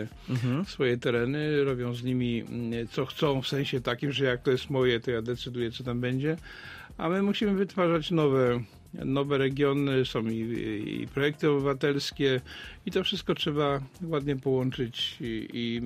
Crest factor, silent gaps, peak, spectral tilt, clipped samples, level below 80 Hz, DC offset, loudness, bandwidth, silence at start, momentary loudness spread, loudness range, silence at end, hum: 16 dB; none; -12 dBFS; -6.5 dB/octave; under 0.1%; -54 dBFS; under 0.1%; -29 LUFS; 15 kHz; 0 s; 8 LU; 2 LU; 0 s; none